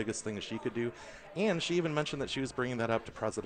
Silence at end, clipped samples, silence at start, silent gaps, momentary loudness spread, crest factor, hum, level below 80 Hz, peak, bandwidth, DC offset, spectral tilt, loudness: 0 s; under 0.1%; 0 s; none; 7 LU; 16 dB; none; -60 dBFS; -18 dBFS; 9.6 kHz; under 0.1%; -4.5 dB/octave; -34 LUFS